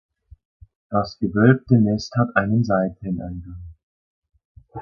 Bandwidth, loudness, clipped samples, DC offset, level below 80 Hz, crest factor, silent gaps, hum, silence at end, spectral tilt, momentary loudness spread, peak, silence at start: 7 kHz; -20 LUFS; under 0.1%; under 0.1%; -46 dBFS; 20 dB; 3.83-4.22 s, 4.45-4.55 s; none; 0 s; -8 dB/octave; 19 LU; -2 dBFS; 0.9 s